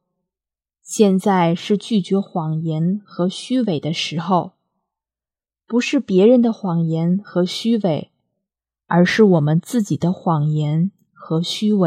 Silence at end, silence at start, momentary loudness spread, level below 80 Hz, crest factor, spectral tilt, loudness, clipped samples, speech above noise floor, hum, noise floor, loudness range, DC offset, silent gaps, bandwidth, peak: 0 s; 0.85 s; 9 LU; -68 dBFS; 18 dB; -6.5 dB/octave; -18 LUFS; under 0.1%; over 73 dB; none; under -90 dBFS; 4 LU; under 0.1%; none; 14 kHz; 0 dBFS